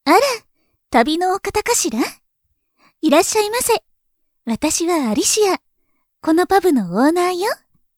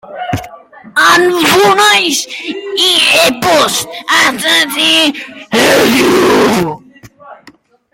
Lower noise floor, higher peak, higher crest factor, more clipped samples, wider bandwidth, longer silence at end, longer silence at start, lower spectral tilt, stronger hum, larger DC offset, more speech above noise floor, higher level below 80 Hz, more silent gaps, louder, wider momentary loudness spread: first, -69 dBFS vs -43 dBFS; about the same, 0 dBFS vs 0 dBFS; first, 18 dB vs 12 dB; neither; first, 20 kHz vs 17.5 kHz; second, 0.4 s vs 0.6 s; about the same, 0.05 s vs 0.05 s; about the same, -3 dB/octave vs -2.5 dB/octave; neither; neither; first, 53 dB vs 33 dB; about the same, -50 dBFS vs -48 dBFS; neither; second, -17 LUFS vs -9 LUFS; second, 10 LU vs 13 LU